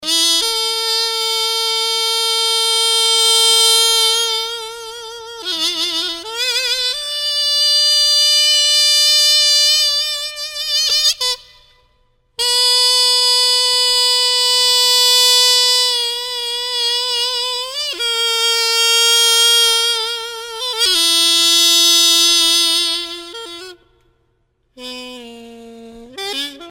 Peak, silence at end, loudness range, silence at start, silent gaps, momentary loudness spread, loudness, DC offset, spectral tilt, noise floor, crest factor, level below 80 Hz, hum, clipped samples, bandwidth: -2 dBFS; 0 s; 6 LU; 0 s; none; 14 LU; -12 LUFS; under 0.1%; 2.5 dB/octave; -63 dBFS; 14 dB; -54 dBFS; none; under 0.1%; 16.5 kHz